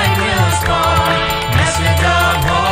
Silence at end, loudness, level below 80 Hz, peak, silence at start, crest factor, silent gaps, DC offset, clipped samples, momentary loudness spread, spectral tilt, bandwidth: 0 s; -13 LUFS; -26 dBFS; -2 dBFS; 0 s; 12 dB; none; under 0.1%; under 0.1%; 2 LU; -4 dB/octave; 16.5 kHz